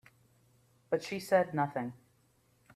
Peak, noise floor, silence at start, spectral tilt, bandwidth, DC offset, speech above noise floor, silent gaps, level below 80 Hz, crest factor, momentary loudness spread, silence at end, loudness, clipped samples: -14 dBFS; -70 dBFS; 0.9 s; -6 dB/octave; 15 kHz; under 0.1%; 38 dB; none; -76 dBFS; 22 dB; 10 LU; 0.8 s; -33 LUFS; under 0.1%